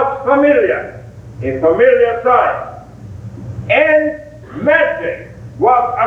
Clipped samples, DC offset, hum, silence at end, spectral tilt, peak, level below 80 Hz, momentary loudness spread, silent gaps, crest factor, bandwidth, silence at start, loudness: under 0.1%; under 0.1%; none; 0 s; -7.5 dB/octave; 0 dBFS; -44 dBFS; 21 LU; none; 14 dB; 7.2 kHz; 0 s; -13 LUFS